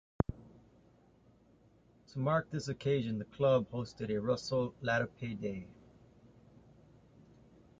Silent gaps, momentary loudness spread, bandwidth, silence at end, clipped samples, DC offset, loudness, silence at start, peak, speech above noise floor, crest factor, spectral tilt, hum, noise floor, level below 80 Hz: none; 11 LU; 8.8 kHz; 2.05 s; under 0.1%; under 0.1%; -35 LUFS; 0.3 s; -12 dBFS; 31 dB; 26 dB; -6.5 dB/octave; none; -65 dBFS; -60 dBFS